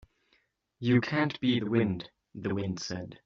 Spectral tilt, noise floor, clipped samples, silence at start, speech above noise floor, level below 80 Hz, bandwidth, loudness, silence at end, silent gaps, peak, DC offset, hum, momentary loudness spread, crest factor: -5.5 dB/octave; -72 dBFS; under 0.1%; 0.8 s; 43 dB; -66 dBFS; 7.6 kHz; -30 LUFS; 0.1 s; none; -12 dBFS; under 0.1%; none; 12 LU; 20 dB